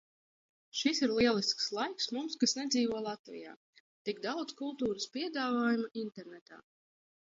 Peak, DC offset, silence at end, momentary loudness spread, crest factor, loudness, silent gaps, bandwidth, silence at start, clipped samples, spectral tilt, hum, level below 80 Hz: -16 dBFS; under 0.1%; 0.8 s; 17 LU; 20 dB; -34 LUFS; 3.19-3.24 s, 3.56-3.73 s, 3.80-4.05 s, 6.41-6.46 s; 7.8 kHz; 0.75 s; under 0.1%; -3 dB/octave; none; -70 dBFS